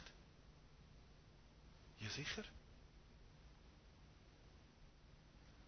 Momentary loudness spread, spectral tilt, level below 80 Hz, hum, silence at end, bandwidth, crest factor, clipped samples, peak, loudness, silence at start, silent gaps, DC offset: 19 LU; -3 dB/octave; -66 dBFS; none; 0 s; 6.4 kHz; 24 dB; under 0.1%; -34 dBFS; -55 LUFS; 0 s; none; under 0.1%